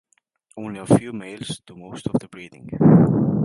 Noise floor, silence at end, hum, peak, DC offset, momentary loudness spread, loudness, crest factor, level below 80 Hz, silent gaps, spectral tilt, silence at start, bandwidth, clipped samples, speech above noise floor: -61 dBFS; 0 s; none; -2 dBFS; under 0.1%; 22 LU; -18 LUFS; 18 dB; -50 dBFS; none; -8 dB/octave; 0.55 s; 11.5 kHz; under 0.1%; 42 dB